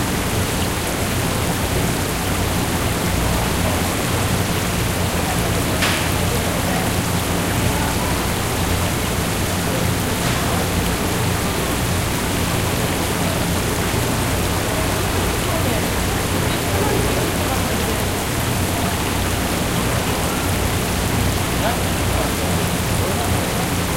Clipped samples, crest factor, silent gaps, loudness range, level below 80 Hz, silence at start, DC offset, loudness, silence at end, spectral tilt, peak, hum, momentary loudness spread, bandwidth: under 0.1%; 14 dB; none; 1 LU; -30 dBFS; 0 s; under 0.1%; -19 LUFS; 0 s; -4 dB/octave; -4 dBFS; none; 1 LU; 16 kHz